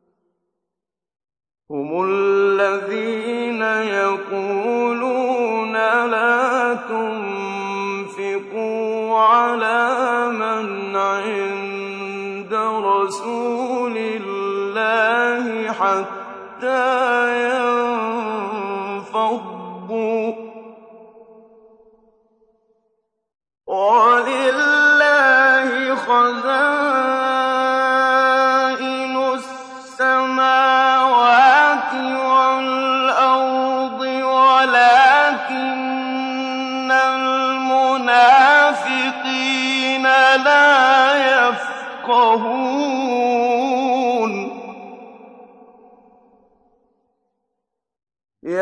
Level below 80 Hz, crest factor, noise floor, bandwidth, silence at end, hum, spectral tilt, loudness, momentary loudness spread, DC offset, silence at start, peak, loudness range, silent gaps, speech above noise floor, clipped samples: -74 dBFS; 16 dB; -85 dBFS; 10.5 kHz; 0 s; none; -3.5 dB/octave; -17 LUFS; 13 LU; under 0.1%; 1.7 s; -2 dBFS; 8 LU; none; 64 dB; under 0.1%